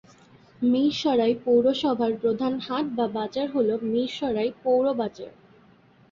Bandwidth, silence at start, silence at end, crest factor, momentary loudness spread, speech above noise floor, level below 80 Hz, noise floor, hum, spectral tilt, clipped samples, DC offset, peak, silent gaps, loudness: 7.4 kHz; 0.6 s; 0.8 s; 14 dB; 7 LU; 32 dB; -64 dBFS; -56 dBFS; none; -6 dB/octave; under 0.1%; under 0.1%; -10 dBFS; none; -25 LUFS